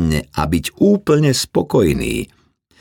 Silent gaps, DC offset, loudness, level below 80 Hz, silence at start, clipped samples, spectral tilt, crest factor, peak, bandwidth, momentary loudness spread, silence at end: none; under 0.1%; -16 LUFS; -36 dBFS; 0 s; under 0.1%; -5.5 dB/octave; 14 dB; -2 dBFS; 19 kHz; 8 LU; 0.55 s